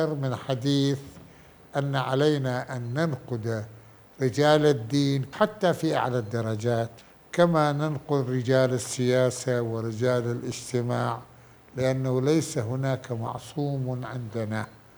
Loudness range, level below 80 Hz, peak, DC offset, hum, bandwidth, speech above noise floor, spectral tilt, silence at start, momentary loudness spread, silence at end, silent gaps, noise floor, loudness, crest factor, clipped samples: 3 LU; -62 dBFS; -6 dBFS; under 0.1%; none; over 20 kHz; 25 dB; -6 dB/octave; 0 s; 10 LU; 0.2 s; none; -51 dBFS; -26 LUFS; 20 dB; under 0.1%